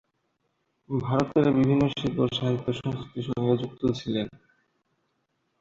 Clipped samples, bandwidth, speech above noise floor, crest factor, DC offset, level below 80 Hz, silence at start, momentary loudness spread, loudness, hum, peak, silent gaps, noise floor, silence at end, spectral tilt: under 0.1%; 7.6 kHz; 49 dB; 20 dB; under 0.1%; -56 dBFS; 0.9 s; 11 LU; -26 LUFS; none; -6 dBFS; none; -75 dBFS; 1.25 s; -7.5 dB/octave